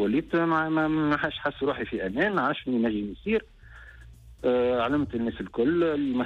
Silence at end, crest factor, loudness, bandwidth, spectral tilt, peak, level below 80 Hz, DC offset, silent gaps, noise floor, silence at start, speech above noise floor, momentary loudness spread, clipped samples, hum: 0 s; 14 dB; -26 LUFS; 6.8 kHz; -8 dB/octave; -14 dBFS; -50 dBFS; under 0.1%; none; -48 dBFS; 0 s; 22 dB; 6 LU; under 0.1%; none